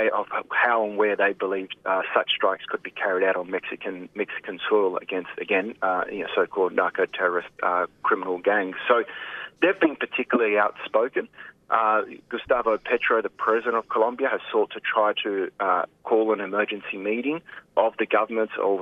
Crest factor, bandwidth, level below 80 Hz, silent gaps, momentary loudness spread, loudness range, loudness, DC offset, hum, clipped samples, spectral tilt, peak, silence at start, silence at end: 20 dB; 5.2 kHz; -68 dBFS; none; 9 LU; 2 LU; -24 LUFS; under 0.1%; none; under 0.1%; -6 dB/octave; -4 dBFS; 0 s; 0 s